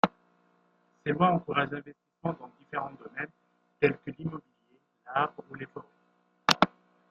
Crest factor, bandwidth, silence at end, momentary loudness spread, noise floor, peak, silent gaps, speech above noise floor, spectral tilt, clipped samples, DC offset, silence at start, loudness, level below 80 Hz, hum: 30 dB; 14.5 kHz; 0.45 s; 17 LU; -70 dBFS; -2 dBFS; none; 39 dB; -5 dB/octave; under 0.1%; under 0.1%; 0.05 s; -31 LUFS; -68 dBFS; none